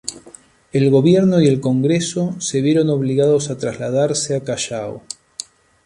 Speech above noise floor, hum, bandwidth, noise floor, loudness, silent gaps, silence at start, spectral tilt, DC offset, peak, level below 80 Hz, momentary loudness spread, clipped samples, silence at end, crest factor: 29 dB; none; 11.5 kHz; -45 dBFS; -17 LUFS; none; 0.05 s; -6 dB/octave; under 0.1%; -2 dBFS; -56 dBFS; 17 LU; under 0.1%; 0.45 s; 16 dB